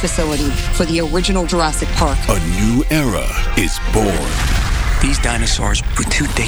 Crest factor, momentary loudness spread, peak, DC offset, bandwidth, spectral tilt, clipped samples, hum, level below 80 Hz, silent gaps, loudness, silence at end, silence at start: 14 dB; 2 LU; 0 dBFS; under 0.1%; over 20 kHz; -4 dB/octave; under 0.1%; none; -18 dBFS; none; -17 LUFS; 0 s; 0 s